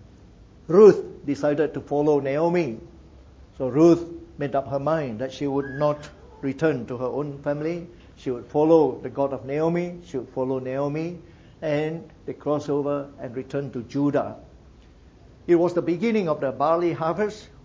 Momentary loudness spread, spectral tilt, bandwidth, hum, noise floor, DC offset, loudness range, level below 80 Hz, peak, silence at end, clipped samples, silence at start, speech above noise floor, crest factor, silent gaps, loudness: 15 LU; -8 dB/octave; 7.6 kHz; none; -50 dBFS; under 0.1%; 7 LU; -54 dBFS; -4 dBFS; 0.15 s; under 0.1%; 0 s; 27 dB; 20 dB; none; -24 LUFS